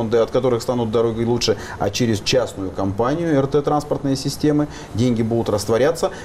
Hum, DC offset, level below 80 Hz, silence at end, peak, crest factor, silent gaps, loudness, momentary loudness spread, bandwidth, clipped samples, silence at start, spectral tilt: none; under 0.1%; -42 dBFS; 0 s; -8 dBFS; 12 dB; none; -20 LUFS; 5 LU; 15.5 kHz; under 0.1%; 0 s; -5.5 dB/octave